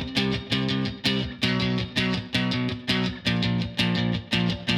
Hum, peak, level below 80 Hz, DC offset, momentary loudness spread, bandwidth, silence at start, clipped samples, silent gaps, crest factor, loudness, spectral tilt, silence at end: none; -10 dBFS; -46 dBFS; under 0.1%; 2 LU; 14 kHz; 0 s; under 0.1%; none; 14 dB; -25 LUFS; -5.5 dB/octave; 0 s